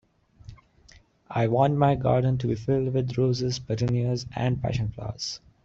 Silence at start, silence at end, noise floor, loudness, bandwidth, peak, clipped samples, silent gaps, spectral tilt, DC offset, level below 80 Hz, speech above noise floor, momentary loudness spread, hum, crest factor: 0.5 s; 0.3 s; -56 dBFS; -26 LUFS; 7.6 kHz; -8 dBFS; under 0.1%; none; -7 dB/octave; under 0.1%; -50 dBFS; 31 dB; 11 LU; none; 18 dB